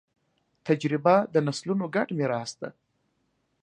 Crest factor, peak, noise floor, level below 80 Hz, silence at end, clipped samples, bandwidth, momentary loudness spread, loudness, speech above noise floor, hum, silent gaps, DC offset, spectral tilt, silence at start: 22 dB; -6 dBFS; -74 dBFS; -74 dBFS; 0.9 s; under 0.1%; 10.5 kHz; 17 LU; -26 LUFS; 48 dB; none; none; under 0.1%; -6 dB/octave; 0.65 s